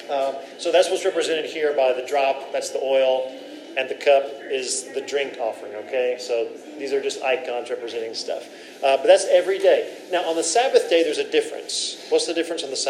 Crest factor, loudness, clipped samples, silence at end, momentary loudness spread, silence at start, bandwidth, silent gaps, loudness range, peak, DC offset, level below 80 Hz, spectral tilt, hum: 20 dB; -22 LUFS; under 0.1%; 0 s; 11 LU; 0 s; 13.5 kHz; none; 6 LU; -2 dBFS; under 0.1%; under -90 dBFS; -1 dB/octave; none